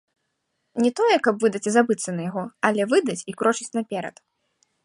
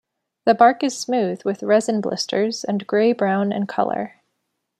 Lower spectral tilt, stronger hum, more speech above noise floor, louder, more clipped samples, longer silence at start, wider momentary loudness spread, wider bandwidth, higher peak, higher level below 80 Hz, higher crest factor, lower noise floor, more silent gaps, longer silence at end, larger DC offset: about the same, -4.5 dB/octave vs -5 dB/octave; neither; about the same, 53 dB vs 56 dB; second, -23 LUFS vs -20 LUFS; neither; first, 0.75 s vs 0.45 s; about the same, 11 LU vs 9 LU; about the same, 11.5 kHz vs 12.5 kHz; about the same, -4 dBFS vs -2 dBFS; about the same, -72 dBFS vs -70 dBFS; about the same, 20 dB vs 18 dB; about the same, -76 dBFS vs -75 dBFS; neither; about the same, 0.75 s vs 0.7 s; neither